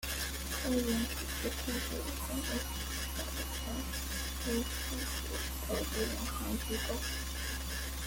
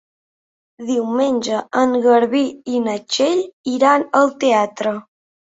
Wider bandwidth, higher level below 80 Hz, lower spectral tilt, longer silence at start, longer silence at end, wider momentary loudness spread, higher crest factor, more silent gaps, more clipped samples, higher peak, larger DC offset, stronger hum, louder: first, 17 kHz vs 8 kHz; first, -42 dBFS vs -64 dBFS; about the same, -3.5 dB/octave vs -4 dB/octave; second, 0 s vs 0.8 s; second, 0 s vs 0.6 s; second, 4 LU vs 9 LU; about the same, 16 dB vs 16 dB; second, none vs 3.53-3.64 s; neither; second, -20 dBFS vs -2 dBFS; neither; neither; second, -36 LUFS vs -17 LUFS